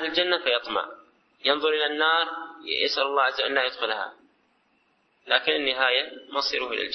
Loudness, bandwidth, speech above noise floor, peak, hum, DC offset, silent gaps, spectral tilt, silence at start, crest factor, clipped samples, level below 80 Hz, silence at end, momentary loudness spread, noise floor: -24 LUFS; 6.4 kHz; 42 dB; -6 dBFS; none; under 0.1%; none; -2 dB/octave; 0 s; 20 dB; under 0.1%; -68 dBFS; 0 s; 8 LU; -67 dBFS